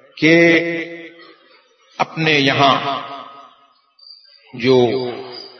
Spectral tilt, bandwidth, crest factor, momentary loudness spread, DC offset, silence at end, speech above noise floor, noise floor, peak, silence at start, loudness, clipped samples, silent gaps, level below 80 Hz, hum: -5.5 dB/octave; 6.6 kHz; 18 dB; 20 LU; under 0.1%; 0.1 s; 38 dB; -54 dBFS; 0 dBFS; 0.15 s; -15 LUFS; under 0.1%; none; -62 dBFS; none